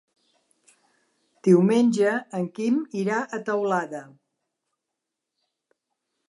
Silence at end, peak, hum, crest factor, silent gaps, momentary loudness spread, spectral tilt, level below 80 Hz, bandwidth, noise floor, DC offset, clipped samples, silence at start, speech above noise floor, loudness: 2.25 s; -6 dBFS; none; 20 dB; none; 10 LU; -7 dB/octave; -80 dBFS; 11.5 kHz; -84 dBFS; under 0.1%; under 0.1%; 1.45 s; 62 dB; -23 LUFS